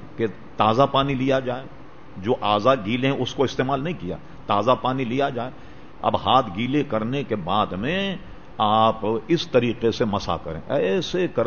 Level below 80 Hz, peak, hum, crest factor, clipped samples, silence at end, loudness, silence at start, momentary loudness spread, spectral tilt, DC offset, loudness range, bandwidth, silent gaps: -48 dBFS; -4 dBFS; none; 20 dB; under 0.1%; 0 s; -23 LUFS; 0 s; 12 LU; -6.5 dB/octave; 1%; 2 LU; 7 kHz; none